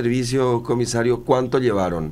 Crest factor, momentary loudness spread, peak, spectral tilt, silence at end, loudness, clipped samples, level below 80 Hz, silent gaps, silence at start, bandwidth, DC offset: 16 dB; 3 LU; -4 dBFS; -6 dB/octave; 0 s; -20 LUFS; under 0.1%; -42 dBFS; none; 0 s; 14.5 kHz; under 0.1%